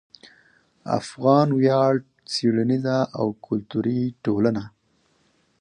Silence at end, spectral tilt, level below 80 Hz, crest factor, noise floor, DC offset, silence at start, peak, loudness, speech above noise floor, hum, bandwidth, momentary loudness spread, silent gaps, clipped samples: 0.9 s; -7 dB/octave; -62 dBFS; 20 dB; -65 dBFS; under 0.1%; 0.85 s; -4 dBFS; -22 LUFS; 44 dB; none; 10 kHz; 10 LU; none; under 0.1%